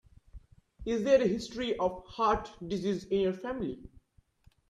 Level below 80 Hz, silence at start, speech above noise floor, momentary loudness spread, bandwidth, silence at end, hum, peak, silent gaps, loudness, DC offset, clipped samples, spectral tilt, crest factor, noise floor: -54 dBFS; 0.35 s; 35 dB; 12 LU; 11 kHz; 0.8 s; none; -12 dBFS; none; -31 LUFS; under 0.1%; under 0.1%; -6 dB/octave; 20 dB; -65 dBFS